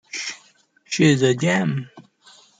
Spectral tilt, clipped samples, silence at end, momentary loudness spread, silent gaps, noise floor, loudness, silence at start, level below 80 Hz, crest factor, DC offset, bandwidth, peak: -5 dB/octave; under 0.1%; 0.6 s; 19 LU; none; -57 dBFS; -20 LUFS; 0.15 s; -62 dBFS; 18 dB; under 0.1%; 9.6 kHz; -4 dBFS